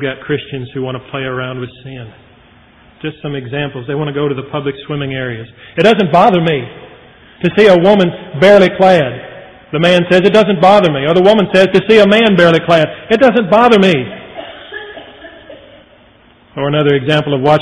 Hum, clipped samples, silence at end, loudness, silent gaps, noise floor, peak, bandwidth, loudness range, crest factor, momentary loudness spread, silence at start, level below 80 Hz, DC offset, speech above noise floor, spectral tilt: none; 0.4%; 0 s; -11 LUFS; none; -45 dBFS; 0 dBFS; 11 kHz; 13 LU; 12 dB; 20 LU; 0 s; -46 dBFS; under 0.1%; 34 dB; -6.5 dB/octave